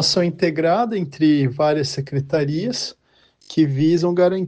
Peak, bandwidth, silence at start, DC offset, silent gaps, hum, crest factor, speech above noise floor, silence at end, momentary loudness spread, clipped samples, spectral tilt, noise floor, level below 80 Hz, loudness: -4 dBFS; 9.4 kHz; 0 s; under 0.1%; none; none; 14 dB; 38 dB; 0 s; 7 LU; under 0.1%; -6 dB/octave; -56 dBFS; -58 dBFS; -19 LUFS